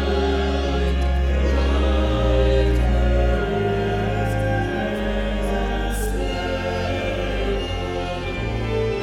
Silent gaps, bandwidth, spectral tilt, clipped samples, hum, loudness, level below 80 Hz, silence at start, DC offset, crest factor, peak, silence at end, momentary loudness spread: none; 13 kHz; -6.5 dB/octave; under 0.1%; none; -22 LUFS; -24 dBFS; 0 s; under 0.1%; 14 dB; -6 dBFS; 0 s; 5 LU